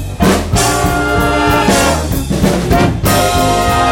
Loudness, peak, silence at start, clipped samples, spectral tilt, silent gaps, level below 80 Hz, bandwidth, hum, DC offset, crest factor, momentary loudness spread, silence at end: -12 LUFS; 0 dBFS; 0 s; under 0.1%; -4.5 dB/octave; none; -22 dBFS; 17 kHz; none; under 0.1%; 12 dB; 3 LU; 0 s